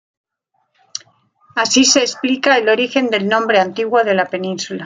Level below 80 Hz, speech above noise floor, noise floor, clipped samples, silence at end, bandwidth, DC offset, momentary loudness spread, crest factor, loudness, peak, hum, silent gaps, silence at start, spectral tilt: -64 dBFS; 53 dB; -68 dBFS; under 0.1%; 0 s; 9.6 kHz; under 0.1%; 15 LU; 16 dB; -15 LUFS; 0 dBFS; none; none; 0.95 s; -2.5 dB/octave